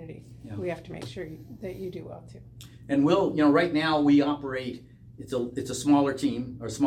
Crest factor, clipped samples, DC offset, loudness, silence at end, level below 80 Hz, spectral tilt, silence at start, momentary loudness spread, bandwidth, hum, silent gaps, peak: 18 dB; under 0.1%; under 0.1%; -26 LUFS; 0 s; -56 dBFS; -6 dB/octave; 0 s; 22 LU; 14 kHz; none; none; -10 dBFS